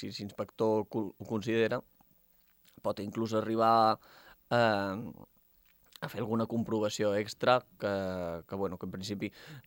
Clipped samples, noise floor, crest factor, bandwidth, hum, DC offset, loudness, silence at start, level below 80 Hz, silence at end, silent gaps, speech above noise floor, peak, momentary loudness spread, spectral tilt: under 0.1%; -67 dBFS; 22 dB; 17 kHz; none; under 0.1%; -32 LUFS; 0 s; -70 dBFS; 0.05 s; none; 35 dB; -12 dBFS; 12 LU; -5.5 dB/octave